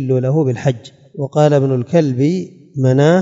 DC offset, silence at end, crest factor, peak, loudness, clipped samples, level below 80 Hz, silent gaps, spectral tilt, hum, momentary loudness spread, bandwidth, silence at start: under 0.1%; 0 s; 14 dB; 0 dBFS; -15 LUFS; under 0.1%; -62 dBFS; none; -8 dB/octave; none; 14 LU; 7.8 kHz; 0 s